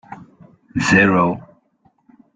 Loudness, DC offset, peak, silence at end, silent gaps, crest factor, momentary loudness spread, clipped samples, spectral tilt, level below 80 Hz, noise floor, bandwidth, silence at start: -16 LUFS; under 0.1%; -2 dBFS; 0.95 s; none; 18 dB; 16 LU; under 0.1%; -5.5 dB/octave; -50 dBFS; -60 dBFS; 9.4 kHz; 0.1 s